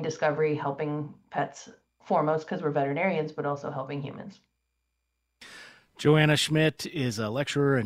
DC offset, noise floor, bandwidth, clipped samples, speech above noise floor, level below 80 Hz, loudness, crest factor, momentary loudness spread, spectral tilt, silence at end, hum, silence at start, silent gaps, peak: under 0.1%; -79 dBFS; 15 kHz; under 0.1%; 52 dB; -64 dBFS; -27 LUFS; 22 dB; 21 LU; -5.5 dB/octave; 0 s; none; 0 s; none; -8 dBFS